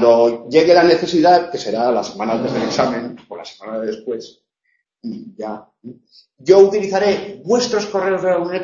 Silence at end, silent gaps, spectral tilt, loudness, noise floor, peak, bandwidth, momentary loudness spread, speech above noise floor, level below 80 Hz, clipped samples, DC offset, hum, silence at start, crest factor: 0 s; none; -5 dB/octave; -16 LUFS; -68 dBFS; 0 dBFS; 7.4 kHz; 19 LU; 52 dB; -58 dBFS; under 0.1%; under 0.1%; none; 0 s; 16 dB